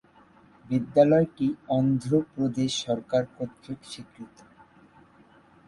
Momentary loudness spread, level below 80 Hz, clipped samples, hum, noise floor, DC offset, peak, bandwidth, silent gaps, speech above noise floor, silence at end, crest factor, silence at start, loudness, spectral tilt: 21 LU; -62 dBFS; under 0.1%; none; -57 dBFS; under 0.1%; -6 dBFS; 11.5 kHz; none; 31 dB; 1.4 s; 20 dB; 0.7 s; -25 LUFS; -6.5 dB/octave